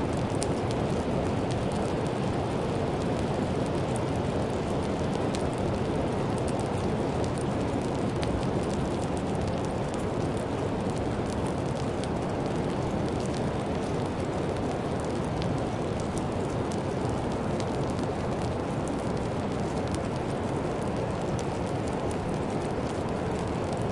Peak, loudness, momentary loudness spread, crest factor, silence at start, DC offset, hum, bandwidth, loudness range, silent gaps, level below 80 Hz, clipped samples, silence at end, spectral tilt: -10 dBFS; -30 LUFS; 2 LU; 20 dB; 0 s; under 0.1%; none; 11.5 kHz; 1 LU; none; -44 dBFS; under 0.1%; 0 s; -6.5 dB/octave